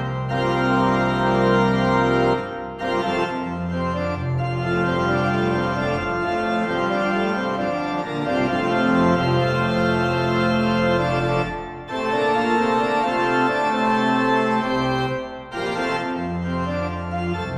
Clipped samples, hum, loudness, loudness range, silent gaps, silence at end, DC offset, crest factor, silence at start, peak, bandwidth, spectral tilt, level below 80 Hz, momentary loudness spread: under 0.1%; none; -21 LUFS; 3 LU; none; 0 s; under 0.1%; 16 dB; 0 s; -6 dBFS; 11 kHz; -7 dB/octave; -44 dBFS; 7 LU